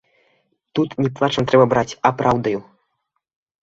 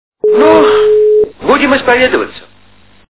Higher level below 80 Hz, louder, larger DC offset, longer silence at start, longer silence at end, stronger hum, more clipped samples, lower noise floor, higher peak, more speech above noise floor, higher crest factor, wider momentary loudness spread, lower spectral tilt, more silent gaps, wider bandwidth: second, -52 dBFS vs -42 dBFS; second, -19 LUFS vs -9 LUFS; second, under 0.1% vs 1%; first, 0.75 s vs 0.25 s; first, 1 s vs 0.75 s; neither; second, under 0.1% vs 0.6%; first, -74 dBFS vs -45 dBFS; about the same, -2 dBFS vs 0 dBFS; first, 57 dB vs 37 dB; first, 18 dB vs 10 dB; first, 10 LU vs 6 LU; second, -6.5 dB/octave vs -8.5 dB/octave; neither; first, 7.8 kHz vs 4 kHz